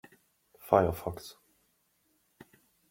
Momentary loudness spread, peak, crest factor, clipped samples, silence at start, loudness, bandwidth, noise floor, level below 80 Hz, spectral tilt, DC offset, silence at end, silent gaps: 23 LU; -8 dBFS; 26 dB; under 0.1%; 0.65 s; -29 LUFS; 16.5 kHz; -73 dBFS; -60 dBFS; -6.5 dB/octave; under 0.1%; 1.6 s; none